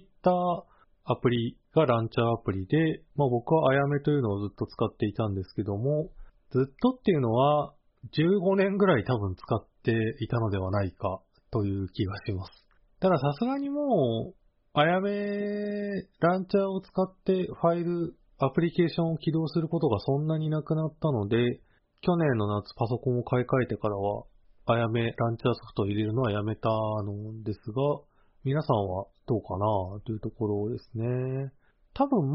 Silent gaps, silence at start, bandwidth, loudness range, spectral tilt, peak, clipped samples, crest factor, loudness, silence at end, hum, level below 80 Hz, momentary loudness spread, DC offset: none; 0.25 s; 5.8 kHz; 4 LU; -6.5 dB/octave; -10 dBFS; under 0.1%; 18 dB; -28 LUFS; 0 s; none; -56 dBFS; 10 LU; under 0.1%